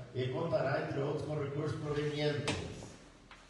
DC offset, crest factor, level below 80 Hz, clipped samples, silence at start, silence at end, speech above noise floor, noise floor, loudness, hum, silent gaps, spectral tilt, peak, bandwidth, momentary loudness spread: under 0.1%; 16 dB; -62 dBFS; under 0.1%; 0 s; 0 s; 21 dB; -57 dBFS; -36 LUFS; none; none; -6 dB/octave; -20 dBFS; 11.5 kHz; 15 LU